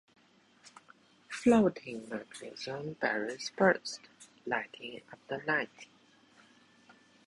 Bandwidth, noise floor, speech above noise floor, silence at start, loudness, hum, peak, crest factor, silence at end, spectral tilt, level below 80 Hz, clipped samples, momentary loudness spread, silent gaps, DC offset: 11.5 kHz; -65 dBFS; 32 dB; 1.3 s; -33 LUFS; none; -12 dBFS; 22 dB; 1.4 s; -5 dB/octave; -70 dBFS; under 0.1%; 19 LU; none; under 0.1%